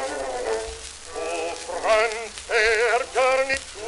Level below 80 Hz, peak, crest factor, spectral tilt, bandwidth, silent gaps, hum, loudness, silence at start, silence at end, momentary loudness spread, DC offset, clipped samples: -48 dBFS; -6 dBFS; 18 dB; -1 dB/octave; 11.5 kHz; none; none; -23 LUFS; 0 s; 0 s; 12 LU; under 0.1%; under 0.1%